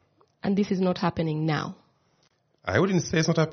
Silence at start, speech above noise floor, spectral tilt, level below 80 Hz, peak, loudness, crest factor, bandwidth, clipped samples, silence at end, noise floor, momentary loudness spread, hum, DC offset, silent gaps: 0.45 s; 43 dB; -6 dB/octave; -58 dBFS; -8 dBFS; -26 LUFS; 18 dB; 6.6 kHz; under 0.1%; 0 s; -68 dBFS; 9 LU; none; under 0.1%; none